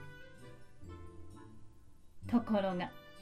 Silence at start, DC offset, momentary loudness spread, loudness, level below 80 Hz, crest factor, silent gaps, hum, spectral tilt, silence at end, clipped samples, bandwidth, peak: 0 s; under 0.1%; 24 LU; -35 LUFS; -62 dBFS; 18 dB; none; none; -7.5 dB/octave; 0 s; under 0.1%; 12.5 kHz; -22 dBFS